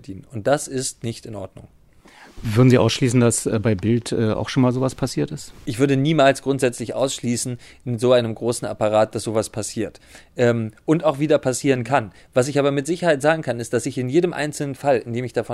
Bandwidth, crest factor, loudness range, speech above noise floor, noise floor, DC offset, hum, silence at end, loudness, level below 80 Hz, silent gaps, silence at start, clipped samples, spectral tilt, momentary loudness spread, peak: 13.5 kHz; 18 dB; 3 LU; 28 dB; -48 dBFS; under 0.1%; none; 0 s; -21 LUFS; -50 dBFS; none; 0.1 s; under 0.1%; -5.5 dB/octave; 12 LU; -2 dBFS